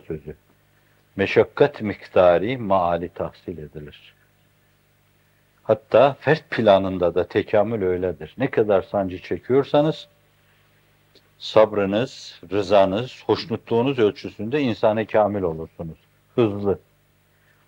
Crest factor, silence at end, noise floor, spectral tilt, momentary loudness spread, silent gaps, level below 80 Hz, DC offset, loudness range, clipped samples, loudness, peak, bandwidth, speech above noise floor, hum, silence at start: 20 dB; 0.9 s; -61 dBFS; -7 dB/octave; 17 LU; none; -58 dBFS; under 0.1%; 4 LU; under 0.1%; -21 LUFS; -2 dBFS; 16.5 kHz; 40 dB; 50 Hz at -50 dBFS; 0.1 s